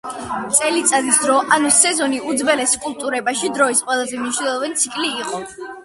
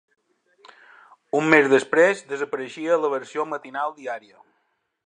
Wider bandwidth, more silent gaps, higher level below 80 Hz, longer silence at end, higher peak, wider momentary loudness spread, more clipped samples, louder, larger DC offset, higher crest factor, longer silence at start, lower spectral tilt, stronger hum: first, 12 kHz vs 10 kHz; neither; first, -58 dBFS vs -74 dBFS; second, 0 s vs 0.9 s; about the same, 0 dBFS vs -2 dBFS; about the same, 11 LU vs 13 LU; neither; first, -17 LUFS vs -21 LUFS; neither; about the same, 18 dB vs 22 dB; second, 0.05 s vs 1.35 s; second, -1 dB/octave vs -5 dB/octave; neither